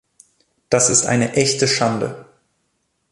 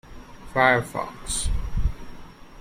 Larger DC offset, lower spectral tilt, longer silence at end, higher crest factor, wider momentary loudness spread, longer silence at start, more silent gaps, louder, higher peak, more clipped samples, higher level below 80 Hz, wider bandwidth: neither; about the same, -3 dB/octave vs -3.5 dB/octave; first, 0.9 s vs 0 s; about the same, 18 dB vs 20 dB; second, 12 LU vs 24 LU; first, 0.7 s vs 0.05 s; neither; first, -17 LUFS vs -25 LUFS; about the same, -2 dBFS vs -4 dBFS; neither; second, -54 dBFS vs -32 dBFS; second, 11.5 kHz vs 16 kHz